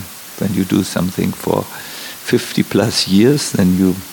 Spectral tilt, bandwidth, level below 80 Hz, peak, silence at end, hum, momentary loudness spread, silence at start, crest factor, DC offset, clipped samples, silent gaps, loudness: -5 dB/octave; 18 kHz; -50 dBFS; -2 dBFS; 0 s; none; 14 LU; 0 s; 14 dB; under 0.1%; under 0.1%; none; -16 LUFS